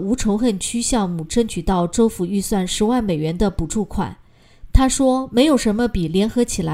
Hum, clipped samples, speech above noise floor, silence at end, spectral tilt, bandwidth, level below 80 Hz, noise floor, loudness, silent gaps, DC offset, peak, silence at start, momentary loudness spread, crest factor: none; under 0.1%; 23 dB; 0 s; -5 dB/octave; 16 kHz; -30 dBFS; -41 dBFS; -19 LUFS; none; under 0.1%; 0 dBFS; 0 s; 7 LU; 18 dB